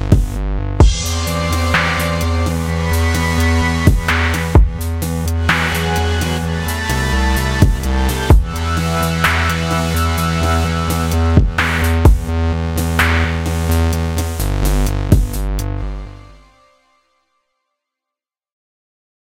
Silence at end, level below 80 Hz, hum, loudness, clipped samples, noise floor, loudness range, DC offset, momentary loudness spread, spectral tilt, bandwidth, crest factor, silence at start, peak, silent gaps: 3 s; -20 dBFS; none; -16 LUFS; under 0.1%; -85 dBFS; 5 LU; under 0.1%; 6 LU; -5 dB/octave; 16.5 kHz; 16 dB; 0 s; 0 dBFS; none